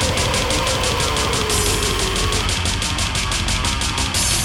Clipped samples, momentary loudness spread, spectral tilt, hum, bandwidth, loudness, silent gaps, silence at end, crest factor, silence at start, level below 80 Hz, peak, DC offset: under 0.1%; 2 LU; -2.5 dB/octave; none; 18 kHz; -18 LUFS; none; 0 s; 14 dB; 0 s; -26 dBFS; -4 dBFS; under 0.1%